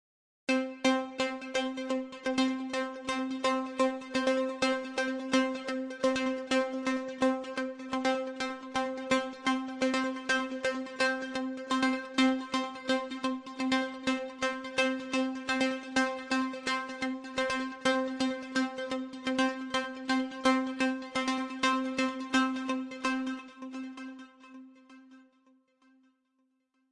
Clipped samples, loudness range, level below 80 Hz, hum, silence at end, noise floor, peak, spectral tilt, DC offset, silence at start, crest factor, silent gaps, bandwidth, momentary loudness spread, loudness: under 0.1%; 2 LU; -70 dBFS; none; 1.7 s; -76 dBFS; -14 dBFS; -3 dB/octave; under 0.1%; 0.5 s; 18 dB; none; 11 kHz; 6 LU; -32 LUFS